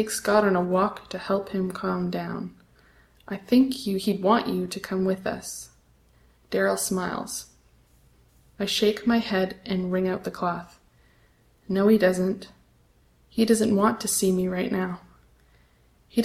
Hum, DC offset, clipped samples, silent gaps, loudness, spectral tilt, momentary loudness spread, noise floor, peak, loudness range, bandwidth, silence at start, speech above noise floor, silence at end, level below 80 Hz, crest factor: none; under 0.1%; under 0.1%; none; -25 LUFS; -5 dB/octave; 14 LU; -60 dBFS; -6 dBFS; 5 LU; 15.5 kHz; 0 s; 36 dB; 0 s; -58 dBFS; 20 dB